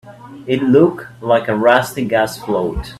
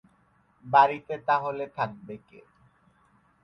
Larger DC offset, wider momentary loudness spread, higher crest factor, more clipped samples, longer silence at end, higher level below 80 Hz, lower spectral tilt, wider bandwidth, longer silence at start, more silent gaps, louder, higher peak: neither; second, 8 LU vs 23 LU; second, 16 dB vs 24 dB; neither; second, 0 s vs 1.25 s; first, -38 dBFS vs -70 dBFS; about the same, -6 dB/octave vs -7 dB/octave; first, 14.5 kHz vs 6.2 kHz; second, 0.05 s vs 0.65 s; neither; first, -15 LUFS vs -25 LUFS; first, 0 dBFS vs -6 dBFS